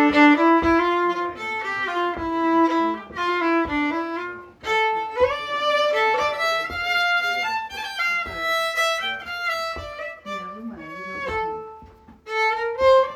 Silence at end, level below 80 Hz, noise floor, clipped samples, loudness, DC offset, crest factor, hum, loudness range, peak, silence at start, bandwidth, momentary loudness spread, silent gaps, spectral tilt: 0 s; -50 dBFS; -46 dBFS; under 0.1%; -22 LUFS; under 0.1%; 18 dB; none; 6 LU; -4 dBFS; 0 s; 19.5 kHz; 15 LU; none; -4 dB/octave